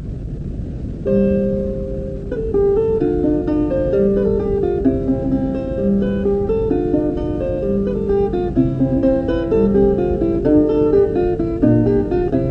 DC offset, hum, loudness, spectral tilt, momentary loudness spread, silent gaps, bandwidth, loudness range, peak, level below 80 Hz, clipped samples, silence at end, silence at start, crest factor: under 0.1%; none; -18 LUFS; -10.5 dB/octave; 10 LU; none; 5.6 kHz; 3 LU; -2 dBFS; -30 dBFS; under 0.1%; 0 s; 0 s; 14 dB